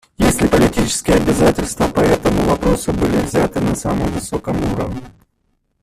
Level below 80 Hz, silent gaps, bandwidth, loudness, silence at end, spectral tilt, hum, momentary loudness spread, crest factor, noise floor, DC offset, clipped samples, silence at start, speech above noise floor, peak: -30 dBFS; none; 15.5 kHz; -16 LUFS; 0.75 s; -5.5 dB/octave; none; 8 LU; 16 dB; -65 dBFS; under 0.1%; under 0.1%; 0.2 s; 49 dB; 0 dBFS